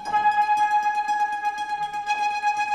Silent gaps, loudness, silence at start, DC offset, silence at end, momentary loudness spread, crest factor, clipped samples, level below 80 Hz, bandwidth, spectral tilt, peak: none; -23 LUFS; 0 s; under 0.1%; 0 s; 7 LU; 12 dB; under 0.1%; -64 dBFS; 13 kHz; -0.5 dB/octave; -10 dBFS